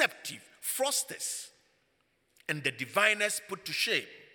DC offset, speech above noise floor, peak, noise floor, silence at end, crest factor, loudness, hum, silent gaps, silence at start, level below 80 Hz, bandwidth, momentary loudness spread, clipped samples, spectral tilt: under 0.1%; 42 dB; -8 dBFS; -73 dBFS; 0.1 s; 24 dB; -30 LUFS; none; none; 0 s; -84 dBFS; 19 kHz; 15 LU; under 0.1%; -1 dB/octave